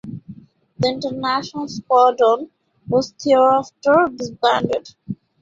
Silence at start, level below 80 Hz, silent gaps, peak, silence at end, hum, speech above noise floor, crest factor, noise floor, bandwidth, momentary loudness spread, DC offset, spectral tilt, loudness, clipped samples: 0.05 s; -58 dBFS; none; -2 dBFS; 0.3 s; none; 24 dB; 16 dB; -42 dBFS; 7.8 kHz; 19 LU; under 0.1%; -5.5 dB/octave; -18 LUFS; under 0.1%